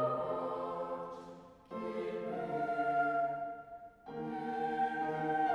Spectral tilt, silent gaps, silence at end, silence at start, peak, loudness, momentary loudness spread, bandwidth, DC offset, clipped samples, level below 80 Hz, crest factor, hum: -7.5 dB/octave; none; 0 s; 0 s; -22 dBFS; -37 LUFS; 15 LU; 10.5 kHz; under 0.1%; under 0.1%; -72 dBFS; 16 dB; none